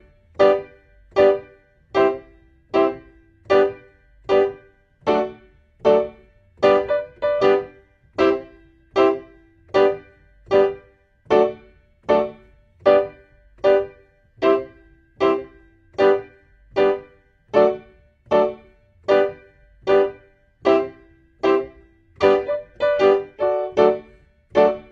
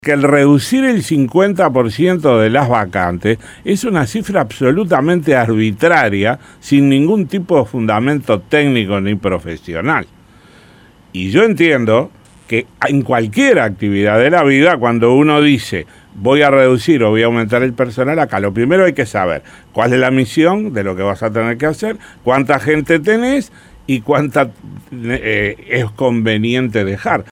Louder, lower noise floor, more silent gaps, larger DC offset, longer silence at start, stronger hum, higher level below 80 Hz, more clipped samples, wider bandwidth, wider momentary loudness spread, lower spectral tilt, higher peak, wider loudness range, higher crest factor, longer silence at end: second, -20 LUFS vs -13 LUFS; first, -53 dBFS vs -44 dBFS; neither; neither; first, 0.4 s vs 0.05 s; neither; second, -54 dBFS vs -46 dBFS; neither; second, 7.2 kHz vs 16 kHz; first, 13 LU vs 9 LU; about the same, -6 dB/octave vs -6.5 dB/octave; about the same, -2 dBFS vs 0 dBFS; second, 2 LU vs 5 LU; first, 20 dB vs 14 dB; about the same, 0.1 s vs 0.1 s